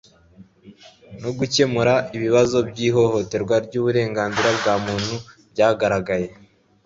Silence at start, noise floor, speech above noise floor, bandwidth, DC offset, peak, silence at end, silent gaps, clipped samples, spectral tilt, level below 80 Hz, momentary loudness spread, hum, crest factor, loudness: 0.4 s; -49 dBFS; 30 dB; 7.8 kHz; under 0.1%; -4 dBFS; 0.5 s; none; under 0.1%; -5 dB/octave; -52 dBFS; 10 LU; none; 18 dB; -20 LUFS